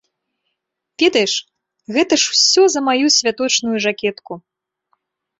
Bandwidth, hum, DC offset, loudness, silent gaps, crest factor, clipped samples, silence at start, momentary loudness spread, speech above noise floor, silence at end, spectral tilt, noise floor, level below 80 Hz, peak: 8 kHz; none; under 0.1%; -15 LUFS; none; 18 dB; under 0.1%; 1 s; 12 LU; 61 dB; 1 s; -1.5 dB/octave; -77 dBFS; -64 dBFS; 0 dBFS